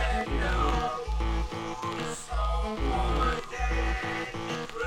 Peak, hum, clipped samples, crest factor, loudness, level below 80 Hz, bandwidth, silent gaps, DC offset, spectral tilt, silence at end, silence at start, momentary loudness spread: -14 dBFS; none; under 0.1%; 14 dB; -31 LUFS; -32 dBFS; 11 kHz; none; under 0.1%; -5 dB/octave; 0 s; 0 s; 7 LU